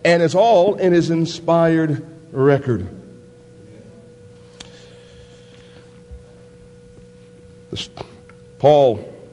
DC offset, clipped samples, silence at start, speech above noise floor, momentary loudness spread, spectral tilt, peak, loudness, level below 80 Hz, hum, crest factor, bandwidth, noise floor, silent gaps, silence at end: under 0.1%; under 0.1%; 0.05 s; 28 dB; 25 LU; -6.5 dB/octave; 0 dBFS; -17 LUFS; -50 dBFS; none; 20 dB; 11 kHz; -44 dBFS; none; 0.15 s